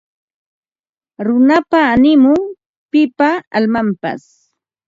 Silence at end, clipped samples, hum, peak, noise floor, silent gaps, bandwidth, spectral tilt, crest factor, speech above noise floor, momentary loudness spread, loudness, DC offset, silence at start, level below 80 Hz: 0.7 s; under 0.1%; none; 0 dBFS; under -90 dBFS; 2.66-2.89 s, 3.47-3.51 s; 7.6 kHz; -7 dB/octave; 14 dB; over 78 dB; 13 LU; -13 LUFS; under 0.1%; 1.2 s; -50 dBFS